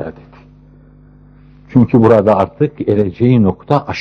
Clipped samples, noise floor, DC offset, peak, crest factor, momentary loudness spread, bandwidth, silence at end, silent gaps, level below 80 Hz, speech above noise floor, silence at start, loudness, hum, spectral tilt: under 0.1%; -42 dBFS; under 0.1%; 0 dBFS; 14 dB; 8 LU; 6.2 kHz; 0 s; none; -44 dBFS; 31 dB; 0 s; -12 LUFS; 50 Hz at -35 dBFS; -9.5 dB/octave